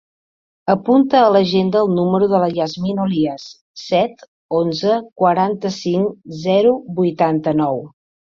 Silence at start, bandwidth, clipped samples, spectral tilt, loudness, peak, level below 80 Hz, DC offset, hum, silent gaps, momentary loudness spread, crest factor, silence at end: 0.65 s; 7.4 kHz; under 0.1%; -7 dB/octave; -17 LUFS; -2 dBFS; -58 dBFS; under 0.1%; none; 3.61-3.75 s, 4.28-4.49 s, 5.12-5.16 s; 10 LU; 16 dB; 0.4 s